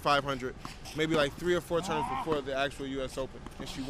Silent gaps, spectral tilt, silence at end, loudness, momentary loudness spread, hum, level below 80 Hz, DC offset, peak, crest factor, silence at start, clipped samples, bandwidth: none; -4.5 dB/octave; 0 s; -32 LUFS; 12 LU; none; -50 dBFS; under 0.1%; -16 dBFS; 16 dB; 0 s; under 0.1%; 15.5 kHz